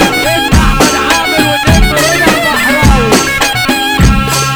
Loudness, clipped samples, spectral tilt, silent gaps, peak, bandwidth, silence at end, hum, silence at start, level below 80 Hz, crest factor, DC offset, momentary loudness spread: -8 LUFS; 0.9%; -4 dB/octave; none; 0 dBFS; over 20 kHz; 0 s; none; 0 s; -16 dBFS; 8 dB; under 0.1%; 2 LU